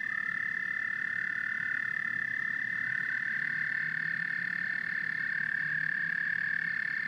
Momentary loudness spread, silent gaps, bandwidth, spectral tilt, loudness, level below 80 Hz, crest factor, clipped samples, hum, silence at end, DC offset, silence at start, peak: 2 LU; none; 12 kHz; -4 dB/octave; -31 LUFS; -80 dBFS; 14 dB; under 0.1%; none; 0 s; under 0.1%; 0 s; -20 dBFS